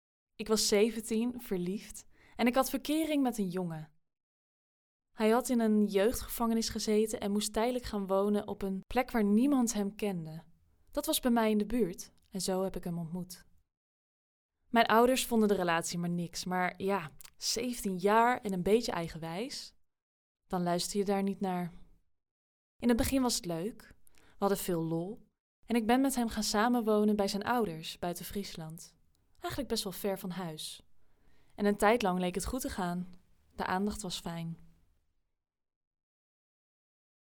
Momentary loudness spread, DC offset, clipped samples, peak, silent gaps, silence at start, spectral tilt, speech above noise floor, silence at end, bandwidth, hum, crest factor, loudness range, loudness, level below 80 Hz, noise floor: 14 LU; under 0.1%; under 0.1%; -12 dBFS; 4.23-5.00 s, 13.77-14.49 s, 20.02-20.35 s, 22.31-22.79 s, 25.40-25.63 s; 0.4 s; -4.5 dB/octave; 44 dB; 2.7 s; over 20 kHz; none; 20 dB; 7 LU; -32 LUFS; -54 dBFS; -76 dBFS